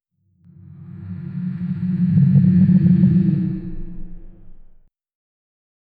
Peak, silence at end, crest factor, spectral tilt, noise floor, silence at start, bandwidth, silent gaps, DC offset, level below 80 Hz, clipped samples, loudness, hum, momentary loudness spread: -4 dBFS; 1.35 s; 14 dB; -13 dB/octave; -55 dBFS; 0.75 s; 2.8 kHz; none; under 0.1%; -40 dBFS; under 0.1%; -17 LUFS; none; 23 LU